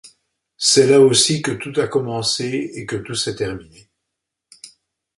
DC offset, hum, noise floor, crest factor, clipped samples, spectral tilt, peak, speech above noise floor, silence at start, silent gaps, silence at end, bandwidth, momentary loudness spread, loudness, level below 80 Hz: under 0.1%; none; -80 dBFS; 18 dB; under 0.1%; -3.5 dB/octave; -2 dBFS; 62 dB; 0.05 s; none; 0.5 s; 11.5 kHz; 15 LU; -17 LUFS; -54 dBFS